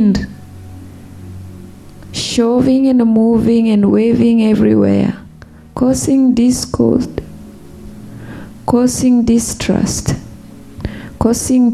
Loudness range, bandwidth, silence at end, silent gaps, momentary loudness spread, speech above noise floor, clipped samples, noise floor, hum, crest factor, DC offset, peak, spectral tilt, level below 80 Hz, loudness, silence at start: 5 LU; 14 kHz; 0 s; none; 22 LU; 26 dB; under 0.1%; -37 dBFS; none; 14 dB; under 0.1%; 0 dBFS; -5.5 dB/octave; -36 dBFS; -13 LUFS; 0 s